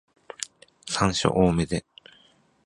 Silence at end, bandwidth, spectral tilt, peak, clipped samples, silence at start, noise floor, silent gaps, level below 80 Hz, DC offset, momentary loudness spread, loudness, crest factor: 0.85 s; 11.5 kHz; -5 dB/octave; -4 dBFS; under 0.1%; 0.4 s; -60 dBFS; none; -46 dBFS; under 0.1%; 18 LU; -25 LUFS; 24 dB